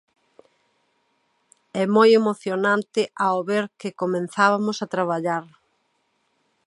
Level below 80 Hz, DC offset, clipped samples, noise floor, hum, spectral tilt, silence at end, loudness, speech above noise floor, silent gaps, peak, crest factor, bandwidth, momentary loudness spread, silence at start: -78 dBFS; under 0.1%; under 0.1%; -70 dBFS; none; -5.5 dB/octave; 1.2 s; -22 LUFS; 49 dB; none; -4 dBFS; 20 dB; 11.5 kHz; 11 LU; 1.75 s